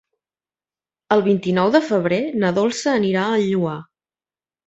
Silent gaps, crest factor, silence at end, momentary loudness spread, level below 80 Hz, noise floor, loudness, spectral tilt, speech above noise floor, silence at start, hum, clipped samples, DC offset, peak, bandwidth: none; 18 dB; 0.85 s; 4 LU; -62 dBFS; under -90 dBFS; -19 LUFS; -6 dB/octave; over 72 dB; 1.1 s; none; under 0.1%; under 0.1%; -2 dBFS; 8.2 kHz